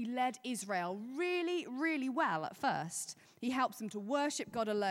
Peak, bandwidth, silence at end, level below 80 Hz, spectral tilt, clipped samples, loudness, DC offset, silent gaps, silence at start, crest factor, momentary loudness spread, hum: -22 dBFS; 16.5 kHz; 0 s; -82 dBFS; -3.5 dB/octave; under 0.1%; -37 LUFS; under 0.1%; none; 0 s; 16 dB; 6 LU; none